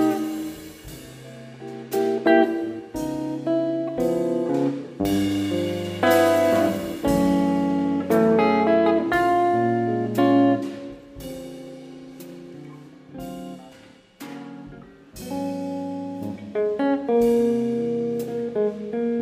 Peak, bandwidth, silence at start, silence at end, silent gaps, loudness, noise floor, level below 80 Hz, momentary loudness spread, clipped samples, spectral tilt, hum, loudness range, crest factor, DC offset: -4 dBFS; 15.5 kHz; 0 s; 0 s; none; -22 LUFS; -49 dBFS; -52 dBFS; 22 LU; under 0.1%; -6.5 dB/octave; none; 18 LU; 20 dB; under 0.1%